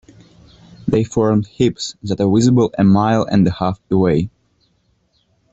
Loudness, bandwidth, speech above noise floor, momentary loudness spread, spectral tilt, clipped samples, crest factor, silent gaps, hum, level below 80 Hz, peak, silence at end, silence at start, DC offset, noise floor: -16 LUFS; 8.2 kHz; 47 dB; 9 LU; -7 dB/octave; under 0.1%; 16 dB; none; none; -46 dBFS; -2 dBFS; 1.25 s; 0.85 s; under 0.1%; -61 dBFS